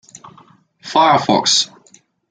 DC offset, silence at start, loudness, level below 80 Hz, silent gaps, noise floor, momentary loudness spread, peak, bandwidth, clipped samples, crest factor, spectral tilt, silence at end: under 0.1%; 0.85 s; -14 LUFS; -62 dBFS; none; -51 dBFS; 11 LU; -2 dBFS; 9.6 kHz; under 0.1%; 16 dB; -2.5 dB/octave; 0.65 s